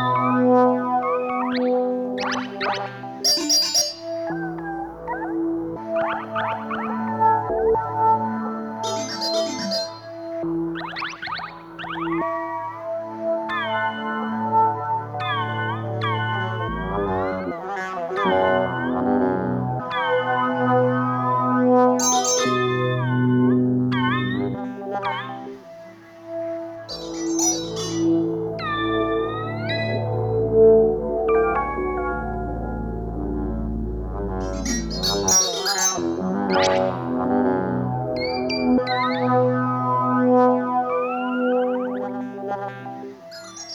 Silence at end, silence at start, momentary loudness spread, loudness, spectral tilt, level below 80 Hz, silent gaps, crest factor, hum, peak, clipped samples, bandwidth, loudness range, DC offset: 0 s; 0 s; 12 LU; -22 LUFS; -4 dB/octave; -42 dBFS; none; 18 dB; none; -6 dBFS; under 0.1%; over 20 kHz; 7 LU; under 0.1%